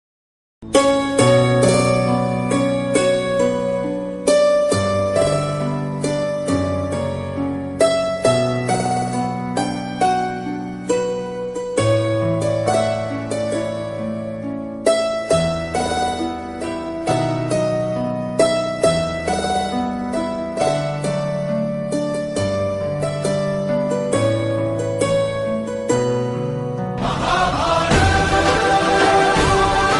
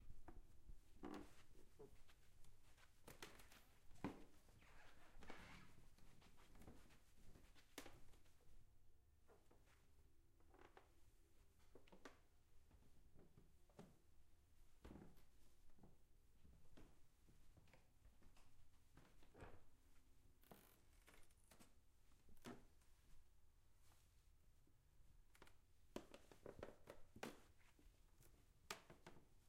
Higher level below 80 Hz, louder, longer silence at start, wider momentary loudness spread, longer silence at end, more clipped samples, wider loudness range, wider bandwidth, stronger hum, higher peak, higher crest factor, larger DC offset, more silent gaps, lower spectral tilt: first, -38 dBFS vs -70 dBFS; first, -19 LUFS vs -63 LUFS; first, 0.6 s vs 0 s; about the same, 9 LU vs 11 LU; about the same, 0 s vs 0 s; neither; about the same, 5 LU vs 7 LU; second, 11.5 kHz vs 15.5 kHz; neither; first, -2 dBFS vs -34 dBFS; second, 16 dB vs 28 dB; neither; neither; about the same, -5 dB/octave vs -4.5 dB/octave